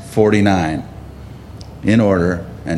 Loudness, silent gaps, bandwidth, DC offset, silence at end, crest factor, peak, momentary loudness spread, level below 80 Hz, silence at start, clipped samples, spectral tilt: -16 LUFS; none; 13 kHz; under 0.1%; 0 s; 16 dB; 0 dBFS; 22 LU; -38 dBFS; 0 s; under 0.1%; -7 dB/octave